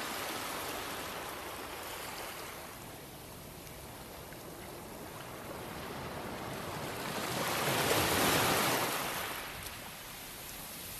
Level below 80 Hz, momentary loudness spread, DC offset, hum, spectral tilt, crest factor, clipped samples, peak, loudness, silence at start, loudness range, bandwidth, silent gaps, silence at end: -58 dBFS; 18 LU; under 0.1%; none; -2.5 dB/octave; 20 dB; under 0.1%; -16 dBFS; -36 LUFS; 0 s; 14 LU; 13.5 kHz; none; 0 s